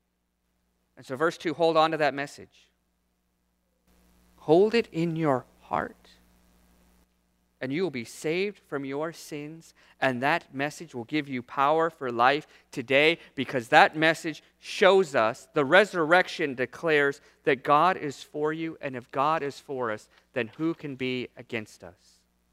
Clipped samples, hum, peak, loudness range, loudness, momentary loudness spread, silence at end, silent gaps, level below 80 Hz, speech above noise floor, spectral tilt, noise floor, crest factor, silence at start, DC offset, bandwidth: under 0.1%; none; -2 dBFS; 10 LU; -26 LUFS; 15 LU; 0.6 s; none; -70 dBFS; 49 dB; -5 dB/octave; -76 dBFS; 26 dB; 1 s; under 0.1%; 15.5 kHz